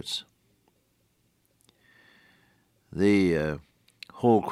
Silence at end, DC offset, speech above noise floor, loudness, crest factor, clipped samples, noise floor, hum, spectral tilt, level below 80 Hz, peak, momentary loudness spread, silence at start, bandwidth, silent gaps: 0 s; under 0.1%; 46 dB; -26 LUFS; 20 dB; under 0.1%; -70 dBFS; none; -6 dB/octave; -60 dBFS; -8 dBFS; 21 LU; 0.05 s; 15 kHz; none